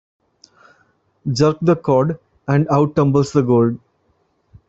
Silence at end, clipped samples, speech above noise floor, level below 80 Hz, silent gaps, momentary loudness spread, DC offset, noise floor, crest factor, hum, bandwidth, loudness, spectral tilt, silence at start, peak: 0.95 s; under 0.1%; 48 dB; -52 dBFS; none; 10 LU; under 0.1%; -63 dBFS; 16 dB; none; 8 kHz; -17 LUFS; -7.5 dB/octave; 1.25 s; -2 dBFS